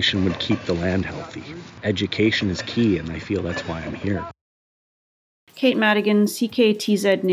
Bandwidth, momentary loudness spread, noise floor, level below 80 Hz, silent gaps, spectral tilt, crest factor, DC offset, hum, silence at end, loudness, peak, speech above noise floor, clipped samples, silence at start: 15 kHz; 11 LU; under -90 dBFS; -44 dBFS; 4.41-5.47 s; -5.5 dB/octave; 18 dB; under 0.1%; none; 0 s; -22 LUFS; -4 dBFS; over 69 dB; under 0.1%; 0 s